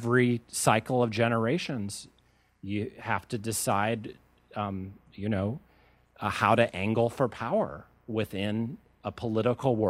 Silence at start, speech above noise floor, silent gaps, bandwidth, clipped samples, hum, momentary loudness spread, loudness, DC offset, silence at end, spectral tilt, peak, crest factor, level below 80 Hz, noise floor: 0 s; 33 dB; none; 16 kHz; under 0.1%; none; 15 LU; -29 LUFS; under 0.1%; 0 s; -5.5 dB/octave; -6 dBFS; 22 dB; -62 dBFS; -61 dBFS